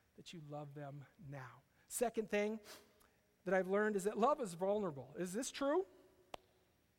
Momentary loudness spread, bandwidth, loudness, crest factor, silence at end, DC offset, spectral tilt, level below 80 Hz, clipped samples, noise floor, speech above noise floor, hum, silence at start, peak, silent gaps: 21 LU; 16.5 kHz; -40 LUFS; 20 dB; 1.1 s; under 0.1%; -5 dB/octave; -76 dBFS; under 0.1%; -75 dBFS; 35 dB; none; 0.2 s; -22 dBFS; none